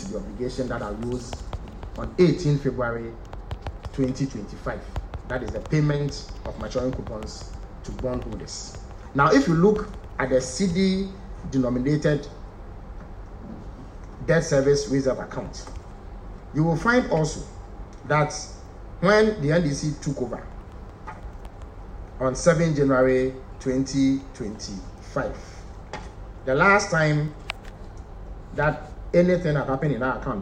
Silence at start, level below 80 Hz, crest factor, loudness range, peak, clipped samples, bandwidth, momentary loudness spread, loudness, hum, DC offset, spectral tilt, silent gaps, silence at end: 0 s; -40 dBFS; 20 dB; 6 LU; -4 dBFS; under 0.1%; 10 kHz; 22 LU; -24 LUFS; none; under 0.1%; -6 dB/octave; none; 0 s